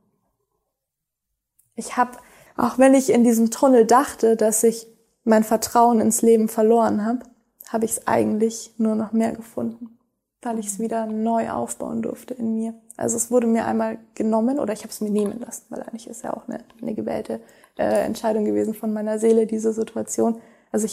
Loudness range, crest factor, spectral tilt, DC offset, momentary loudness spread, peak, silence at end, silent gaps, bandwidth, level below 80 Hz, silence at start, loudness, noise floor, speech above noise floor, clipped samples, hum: 9 LU; 18 dB; -5 dB/octave; under 0.1%; 15 LU; -4 dBFS; 0 s; none; 16 kHz; -62 dBFS; 1.8 s; -21 LUFS; -82 dBFS; 62 dB; under 0.1%; none